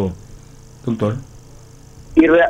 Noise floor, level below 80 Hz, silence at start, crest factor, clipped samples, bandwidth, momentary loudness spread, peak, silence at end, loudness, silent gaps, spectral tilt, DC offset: -41 dBFS; -42 dBFS; 0 s; 18 dB; under 0.1%; 8.6 kHz; 22 LU; 0 dBFS; 0 s; -19 LUFS; none; -7.5 dB/octave; under 0.1%